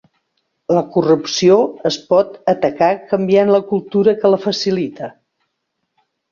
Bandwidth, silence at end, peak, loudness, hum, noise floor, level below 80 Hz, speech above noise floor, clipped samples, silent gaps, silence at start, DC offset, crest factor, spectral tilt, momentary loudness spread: 7.4 kHz; 1.2 s; -2 dBFS; -15 LUFS; none; -73 dBFS; -60 dBFS; 58 dB; under 0.1%; none; 0.7 s; under 0.1%; 16 dB; -5.5 dB/octave; 9 LU